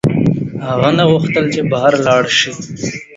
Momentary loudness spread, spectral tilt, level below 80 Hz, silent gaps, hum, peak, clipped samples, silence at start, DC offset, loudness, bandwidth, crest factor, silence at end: 10 LU; -5 dB/octave; -44 dBFS; none; none; 0 dBFS; under 0.1%; 0.05 s; under 0.1%; -14 LUFS; 8 kHz; 14 dB; 0 s